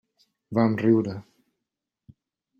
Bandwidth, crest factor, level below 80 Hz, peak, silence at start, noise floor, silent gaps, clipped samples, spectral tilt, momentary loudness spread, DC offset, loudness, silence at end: 7 kHz; 20 dB; -66 dBFS; -8 dBFS; 0.5 s; -85 dBFS; none; under 0.1%; -9.5 dB/octave; 13 LU; under 0.1%; -24 LUFS; 1.4 s